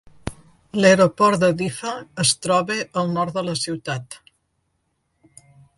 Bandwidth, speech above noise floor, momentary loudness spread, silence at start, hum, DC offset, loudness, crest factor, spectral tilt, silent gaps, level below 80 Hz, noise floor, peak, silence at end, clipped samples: 11.5 kHz; 51 dB; 20 LU; 0.25 s; none; under 0.1%; -20 LUFS; 20 dB; -4 dB/octave; none; -54 dBFS; -71 dBFS; -2 dBFS; 1.6 s; under 0.1%